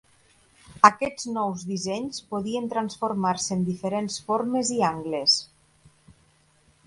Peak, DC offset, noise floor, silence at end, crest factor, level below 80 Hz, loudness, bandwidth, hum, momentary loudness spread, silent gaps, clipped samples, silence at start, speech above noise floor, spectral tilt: 0 dBFS; under 0.1%; -62 dBFS; 1.4 s; 26 dB; -64 dBFS; -25 LUFS; 11.5 kHz; none; 11 LU; none; under 0.1%; 0.7 s; 37 dB; -3.5 dB/octave